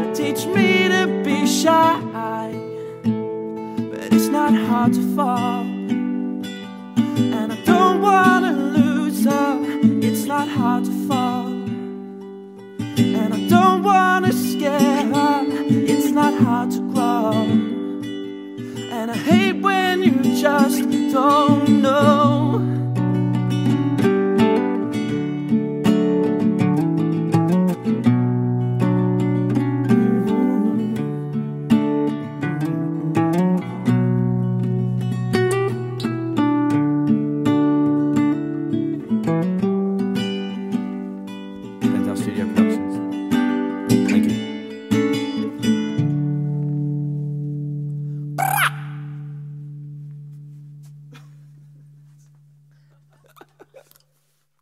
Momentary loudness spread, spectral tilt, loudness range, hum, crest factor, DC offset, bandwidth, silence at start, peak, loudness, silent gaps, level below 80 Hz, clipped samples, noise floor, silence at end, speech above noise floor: 13 LU; -6.5 dB/octave; 6 LU; none; 18 dB; under 0.1%; 16 kHz; 0 s; -2 dBFS; -19 LUFS; none; -60 dBFS; under 0.1%; -67 dBFS; 0.85 s; 50 dB